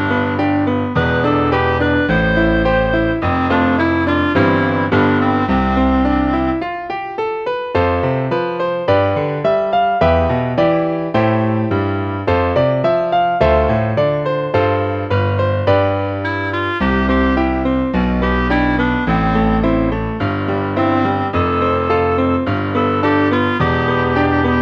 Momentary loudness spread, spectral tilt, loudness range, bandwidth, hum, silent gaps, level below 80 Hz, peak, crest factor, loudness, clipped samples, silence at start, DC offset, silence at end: 5 LU; -8.5 dB/octave; 2 LU; 6.8 kHz; none; none; -30 dBFS; -2 dBFS; 14 dB; -16 LUFS; under 0.1%; 0 s; under 0.1%; 0 s